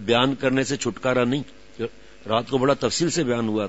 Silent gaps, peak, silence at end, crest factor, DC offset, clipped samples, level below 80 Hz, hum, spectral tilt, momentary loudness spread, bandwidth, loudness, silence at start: none; -4 dBFS; 0 s; 20 dB; 0.5%; under 0.1%; -54 dBFS; none; -4.5 dB/octave; 12 LU; 8 kHz; -23 LUFS; 0 s